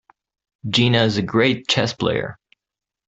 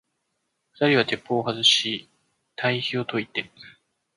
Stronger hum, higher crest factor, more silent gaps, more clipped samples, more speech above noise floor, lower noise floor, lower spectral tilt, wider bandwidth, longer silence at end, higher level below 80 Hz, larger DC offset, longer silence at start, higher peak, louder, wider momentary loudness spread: neither; about the same, 18 dB vs 22 dB; neither; neither; first, 69 dB vs 52 dB; first, -87 dBFS vs -76 dBFS; first, -5 dB/octave vs -3.5 dB/octave; second, 8.2 kHz vs 11.5 kHz; first, 0.75 s vs 0.5 s; first, -54 dBFS vs -68 dBFS; neither; second, 0.65 s vs 0.8 s; about the same, -2 dBFS vs -4 dBFS; first, -19 LUFS vs -23 LUFS; second, 10 LU vs 14 LU